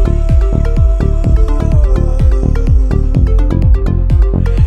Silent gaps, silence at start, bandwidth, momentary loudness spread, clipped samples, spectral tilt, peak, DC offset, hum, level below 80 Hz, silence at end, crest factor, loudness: none; 0 s; 6 kHz; 1 LU; under 0.1%; -9 dB/octave; 0 dBFS; 0.8%; none; -10 dBFS; 0 s; 8 dB; -13 LUFS